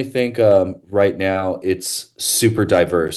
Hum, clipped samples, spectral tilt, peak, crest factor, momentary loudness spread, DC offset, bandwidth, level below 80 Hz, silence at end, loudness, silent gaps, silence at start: none; under 0.1%; -4.5 dB/octave; -4 dBFS; 14 dB; 7 LU; under 0.1%; 13 kHz; -50 dBFS; 0 s; -17 LUFS; none; 0 s